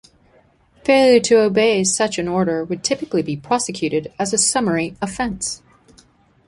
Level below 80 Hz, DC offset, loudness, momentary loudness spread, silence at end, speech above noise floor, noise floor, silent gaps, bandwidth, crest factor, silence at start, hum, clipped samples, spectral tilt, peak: -52 dBFS; under 0.1%; -18 LUFS; 11 LU; 0.9 s; 37 dB; -55 dBFS; none; 11.5 kHz; 18 dB; 0.85 s; none; under 0.1%; -3.5 dB/octave; -2 dBFS